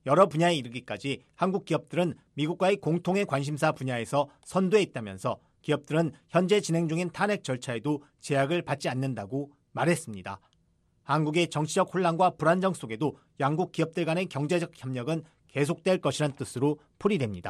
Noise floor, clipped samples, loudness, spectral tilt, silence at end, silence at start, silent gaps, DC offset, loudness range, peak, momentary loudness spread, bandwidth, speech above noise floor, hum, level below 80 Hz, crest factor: -69 dBFS; under 0.1%; -28 LUFS; -6 dB/octave; 0 s; 0.05 s; none; under 0.1%; 3 LU; -8 dBFS; 9 LU; 13 kHz; 41 dB; none; -68 dBFS; 20 dB